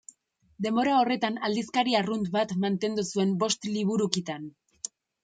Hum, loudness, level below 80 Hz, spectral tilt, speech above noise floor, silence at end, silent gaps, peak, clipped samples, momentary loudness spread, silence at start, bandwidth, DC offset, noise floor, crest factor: none; -27 LUFS; -70 dBFS; -4.5 dB/octave; 36 dB; 0.35 s; none; -4 dBFS; under 0.1%; 15 LU; 0.6 s; 9.4 kHz; under 0.1%; -63 dBFS; 24 dB